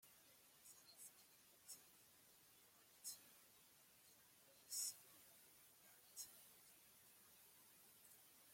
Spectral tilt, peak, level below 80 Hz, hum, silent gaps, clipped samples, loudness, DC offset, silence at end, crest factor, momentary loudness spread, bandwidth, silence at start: 1 dB/octave; -36 dBFS; under -90 dBFS; none; none; under 0.1%; -59 LUFS; under 0.1%; 0 s; 28 dB; 17 LU; 16.5 kHz; 0 s